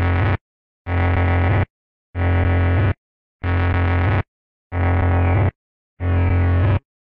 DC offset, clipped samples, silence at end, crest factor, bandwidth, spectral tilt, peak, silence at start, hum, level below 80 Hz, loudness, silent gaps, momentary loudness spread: 0.6%; under 0.1%; 0.3 s; 10 dB; 4.2 kHz; -10.5 dB/octave; -8 dBFS; 0 s; none; -30 dBFS; -20 LUFS; 0.41-0.85 s, 1.70-2.13 s, 2.98-3.40 s, 4.28-4.70 s, 5.55-5.97 s; 10 LU